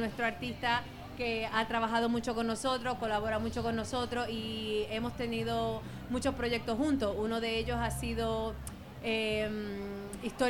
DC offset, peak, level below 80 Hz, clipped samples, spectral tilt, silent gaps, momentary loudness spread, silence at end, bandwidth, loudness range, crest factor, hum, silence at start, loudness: under 0.1%; -16 dBFS; -50 dBFS; under 0.1%; -5 dB/octave; none; 8 LU; 0 s; 17 kHz; 2 LU; 18 dB; none; 0 s; -34 LUFS